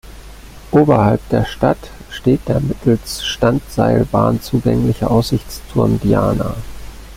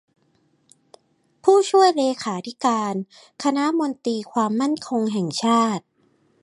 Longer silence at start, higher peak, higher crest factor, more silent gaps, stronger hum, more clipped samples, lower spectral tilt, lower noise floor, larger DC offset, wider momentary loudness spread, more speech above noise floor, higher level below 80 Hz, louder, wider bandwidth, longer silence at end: second, 0.05 s vs 1.45 s; about the same, -2 dBFS vs -4 dBFS; about the same, 14 dB vs 18 dB; neither; neither; neither; first, -7 dB/octave vs -5 dB/octave; second, -35 dBFS vs -64 dBFS; neither; about the same, 9 LU vs 11 LU; second, 21 dB vs 43 dB; first, -34 dBFS vs -74 dBFS; first, -16 LUFS vs -21 LUFS; first, 16 kHz vs 11.5 kHz; second, 0 s vs 0.65 s